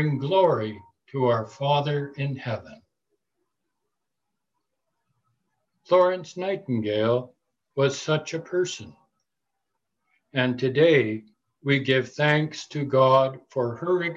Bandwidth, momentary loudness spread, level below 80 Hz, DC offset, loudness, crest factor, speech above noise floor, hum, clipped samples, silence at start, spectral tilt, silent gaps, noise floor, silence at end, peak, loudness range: 8 kHz; 12 LU; -66 dBFS; under 0.1%; -24 LUFS; 18 dB; 60 dB; none; under 0.1%; 0 s; -6 dB/octave; none; -84 dBFS; 0 s; -8 dBFS; 8 LU